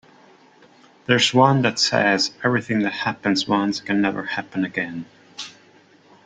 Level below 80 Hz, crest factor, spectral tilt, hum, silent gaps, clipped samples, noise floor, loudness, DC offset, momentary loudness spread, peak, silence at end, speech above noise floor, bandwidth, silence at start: -62 dBFS; 20 dB; -4.5 dB/octave; none; none; under 0.1%; -53 dBFS; -20 LUFS; under 0.1%; 19 LU; -2 dBFS; 0.75 s; 32 dB; 9.4 kHz; 1.1 s